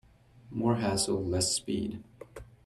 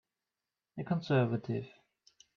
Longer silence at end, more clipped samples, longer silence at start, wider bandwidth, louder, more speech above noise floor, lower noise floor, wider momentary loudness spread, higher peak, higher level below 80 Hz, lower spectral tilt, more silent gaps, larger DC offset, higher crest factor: second, 0.2 s vs 0.7 s; neither; second, 0.45 s vs 0.75 s; first, 15 kHz vs 6.8 kHz; first, -30 LUFS vs -34 LUFS; second, 25 dB vs over 57 dB; second, -55 dBFS vs under -90 dBFS; about the same, 21 LU vs 19 LU; about the same, -14 dBFS vs -16 dBFS; first, -58 dBFS vs -72 dBFS; second, -4 dB/octave vs -8.5 dB/octave; neither; neither; about the same, 18 dB vs 20 dB